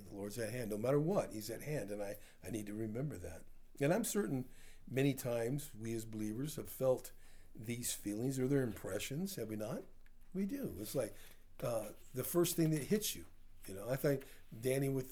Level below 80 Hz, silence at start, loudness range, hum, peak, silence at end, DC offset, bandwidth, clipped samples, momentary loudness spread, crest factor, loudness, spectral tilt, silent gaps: -58 dBFS; 0 s; 3 LU; none; -22 dBFS; 0 s; under 0.1%; over 20 kHz; under 0.1%; 13 LU; 18 dB; -40 LUFS; -5.5 dB/octave; none